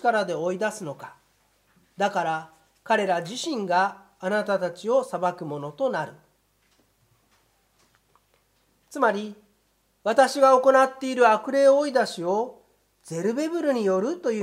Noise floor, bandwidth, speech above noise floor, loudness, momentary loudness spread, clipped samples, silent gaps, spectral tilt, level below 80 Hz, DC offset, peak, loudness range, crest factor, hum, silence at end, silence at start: -68 dBFS; 14.5 kHz; 45 dB; -24 LUFS; 15 LU; under 0.1%; none; -4.5 dB/octave; -74 dBFS; under 0.1%; -6 dBFS; 12 LU; 20 dB; none; 0 s; 0.05 s